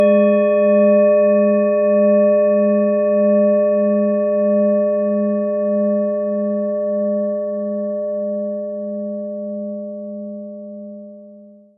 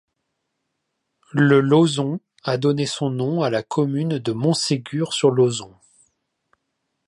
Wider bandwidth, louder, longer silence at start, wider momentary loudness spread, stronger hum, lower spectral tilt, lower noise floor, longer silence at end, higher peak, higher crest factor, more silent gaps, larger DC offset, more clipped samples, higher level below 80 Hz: second, 3.5 kHz vs 11.5 kHz; first, -17 LUFS vs -20 LUFS; second, 0 s vs 1.35 s; first, 16 LU vs 9 LU; neither; first, -9 dB/octave vs -5.5 dB/octave; second, -43 dBFS vs -76 dBFS; second, 0.3 s vs 1.4 s; about the same, -4 dBFS vs -4 dBFS; second, 12 dB vs 18 dB; neither; neither; neither; second, -78 dBFS vs -66 dBFS